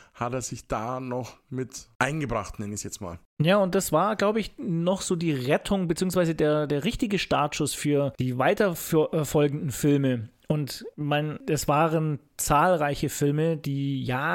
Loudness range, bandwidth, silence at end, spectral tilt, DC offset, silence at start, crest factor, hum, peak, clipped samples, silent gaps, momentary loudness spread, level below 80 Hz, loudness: 2 LU; 17 kHz; 0 s; -5.5 dB/octave; under 0.1%; 0.15 s; 20 dB; none; -6 dBFS; under 0.1%; 1.95-2.00 s, 3.25-3.37 s; 10 LU; -48 dBFS; -26 LUFS